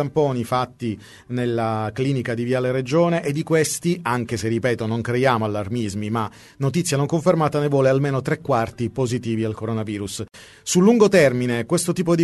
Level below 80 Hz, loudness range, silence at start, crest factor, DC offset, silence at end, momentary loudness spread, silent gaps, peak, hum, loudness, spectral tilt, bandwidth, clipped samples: -54 dBFS; 3 LU; 0 s; 18 dB; under 0.1%; 0 s; 9 LU; none; -2 dBFS; none; -21 LUFS; -6 dB/octave; 12 kHz; under 0.1%